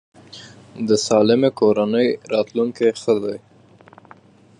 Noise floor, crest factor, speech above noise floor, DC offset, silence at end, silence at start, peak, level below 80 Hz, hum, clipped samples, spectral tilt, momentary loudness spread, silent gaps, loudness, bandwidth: -48 dBFS; 18 dB; 30 dB; under 0.1%; 1.25 s; 0.35 s; -2 dBFS; -64 dBFS; none; under 0.1%; -5 dB/octave; 23 LU; none; -19 LUFS; 10.5 kHz